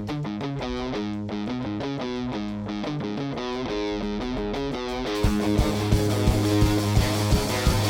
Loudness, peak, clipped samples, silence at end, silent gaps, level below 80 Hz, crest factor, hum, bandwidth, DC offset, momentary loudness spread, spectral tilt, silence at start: -26 LUFS; -8 dBFS; under 0.1%; 0 s; none; -32 dBFS; 16 dB; none; 17.5 kHz; under 0.1%; 8 LU; -6 dB/octave; 0 s